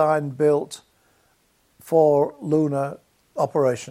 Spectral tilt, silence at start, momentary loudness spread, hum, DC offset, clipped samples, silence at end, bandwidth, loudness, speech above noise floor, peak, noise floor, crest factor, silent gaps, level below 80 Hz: -7 dB/octave; 0 s; 15 LU; none; under 0.1%; under 0.1%; 0 s; 15 kHz; -21 LUFS; 43 dB; -6 dBFS; -64 dBFS; 16 dB; none; -68 dBFS